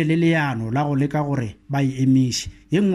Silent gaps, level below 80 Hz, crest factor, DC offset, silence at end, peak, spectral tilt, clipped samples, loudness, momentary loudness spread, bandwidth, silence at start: none; -48 dBFS; 12 dB; under 0.1%; 0 s; -8 dBFS; -6 dB/octave; under 0.1%; -21 LUFS; 8 LU; 13 kHz; 0 s